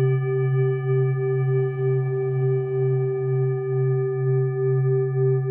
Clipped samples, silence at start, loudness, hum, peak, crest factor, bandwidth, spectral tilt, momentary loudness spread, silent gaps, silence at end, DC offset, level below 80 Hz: under 0.1%; 0 s; -23 LUFS; none; -12 dBFS; 10 dB; 3.1 kHz; -13.5 dB/octave; 2 LU; none; 0 s; under 0.1%; -72 dBFS